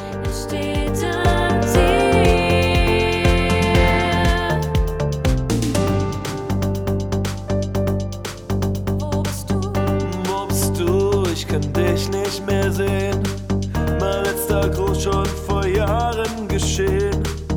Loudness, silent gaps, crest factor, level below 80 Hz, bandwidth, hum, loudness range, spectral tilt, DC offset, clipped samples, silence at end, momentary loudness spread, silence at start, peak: -20 LUFS; none; 16 dB; -26 dBFS; over 20 kHz; none; 6 LU; -5.5 dB/octave; under 0.1%; under 0.1%; 0 s; 7 LU; 0 s; -2 dBFS